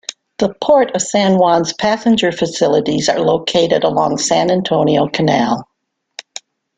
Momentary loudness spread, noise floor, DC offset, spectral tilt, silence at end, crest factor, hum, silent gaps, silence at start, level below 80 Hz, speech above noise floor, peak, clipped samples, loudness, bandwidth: 15 LU; -38 dBFS; under 0.1%; -4.5 dB/octave; 0.55 s; 14 dB; none; none; 0.1 s; -52 dBFS; 25 dB; 0 dBFS; under 0.1%; -14 LUFS; 9.6 kHz